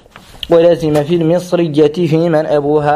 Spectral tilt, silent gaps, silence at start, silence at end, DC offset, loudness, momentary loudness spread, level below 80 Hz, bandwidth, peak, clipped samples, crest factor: -7.5 dB/octave; none; 0.15 s; 0 s; under 0.1%; -12 LUFS; 4 LU; -44 dBFS; 14 kHz; 0 dBFS; under 0.1%; 12 dB